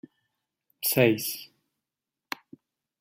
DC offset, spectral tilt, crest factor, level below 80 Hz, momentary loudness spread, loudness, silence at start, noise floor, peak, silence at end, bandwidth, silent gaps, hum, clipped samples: under 0.1%; -4.5 dB/octave; 24 dB; -70 dBFS; 17 LU; -25 LUFS; 0.8 s; -88 dBFS; -8 dBFS; 1.55 s; 16 kHz; none; none; under 0.1%